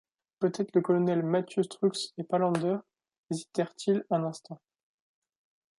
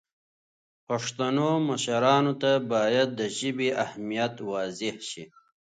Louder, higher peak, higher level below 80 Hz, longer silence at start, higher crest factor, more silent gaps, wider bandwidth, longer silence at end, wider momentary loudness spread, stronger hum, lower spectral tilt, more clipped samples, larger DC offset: second, -30 LUFS vs -26 LUFS; second, -12 dBFS vs -8 dBFS; second, -80 dBFS vs -74 dBFS; second, 0.4 s vs 0.9 s; about the same, 18 dB vs 20 dB; first, 3.18-3.24 s vs none; first, 11.5 kHz vs 9.4 kHz; first, 1.2 s vs 0.5 s; about the same, 11 LU vs 10 LU; neither; first, -6.5 dB/octave vs -4.5 dB/octave; neither; neither